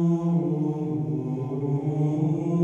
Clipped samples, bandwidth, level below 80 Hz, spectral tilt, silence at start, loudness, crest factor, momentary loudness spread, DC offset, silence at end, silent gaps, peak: under 0.1%; 7.2 kHz; -62 dBFS; -11 dB/octave; 0 s; -26 LUFS; 12 dB; 5 LU; under 0.1%; 0 s; none; -12 dBFS